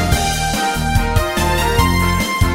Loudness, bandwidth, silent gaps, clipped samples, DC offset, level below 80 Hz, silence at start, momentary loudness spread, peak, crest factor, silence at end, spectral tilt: -16 LUFS; 16.5 kHz; none; under 0.1%; under 0.1%; -22 dBFS; 0 s; 3 LU; 0 dBFS; 14 dB; 0 s; -4.5 dB/octave